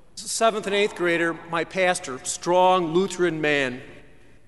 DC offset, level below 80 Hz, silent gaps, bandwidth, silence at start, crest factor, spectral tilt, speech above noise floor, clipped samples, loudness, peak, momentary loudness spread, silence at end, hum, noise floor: 0.3%; -58 dBFS; none; 11.5 kHz; 0.15 s; 18 dB; -3.5 dB/octave; 29 dB; under 0.1%; -23 LUFS; -6 dBFS; 9 LU; 0.5 s; none; -52 dBFS